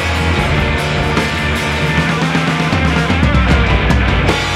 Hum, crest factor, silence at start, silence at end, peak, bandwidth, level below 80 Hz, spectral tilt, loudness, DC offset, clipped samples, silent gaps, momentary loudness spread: none; 12 dB; 0 s; 0 s; 0 dBFS; 14 kHz; -20 dBFS; -5.5 dB/octave; -14 LUFS; under 0.1%; under 0.1%; none; 3 LU